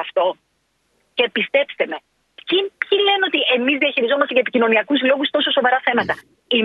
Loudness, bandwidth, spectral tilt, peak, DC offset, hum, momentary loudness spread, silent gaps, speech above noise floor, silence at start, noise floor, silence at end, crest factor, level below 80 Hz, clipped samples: -18 LUFS; 5.6 kHz; -5.5 dB/octave; -2 dBFS; under 0.1%; none; 9 LU; none; 49 dB; 0 s; -67 dBFS; 0 s; 18 dB; -68 dBFS; under 0.1%